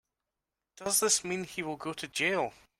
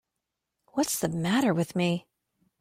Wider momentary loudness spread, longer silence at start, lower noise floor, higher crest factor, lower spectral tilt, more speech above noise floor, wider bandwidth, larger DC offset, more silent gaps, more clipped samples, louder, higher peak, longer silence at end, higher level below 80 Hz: first, 12 LU vs 7 LU; about the same, 0.8 s vs 0.75 s; about the same, -88 dBFS vs -85 dBFS; about the same, 20 dB vs 18 dB; second, -1.5 dB/octave vs -5 dB/octave; about the same, 57 dB vs 58 dB; about the same, 16 kHz vs 16.5 kHz; neither; neither; neither; about the same, -30 LUFS vs -28 LUFS; about the same, -14 dBFS vs -12 dBFS; second, 0.3 s vs 0.6 s; about the same, -70 dBFS vs -66 dBFS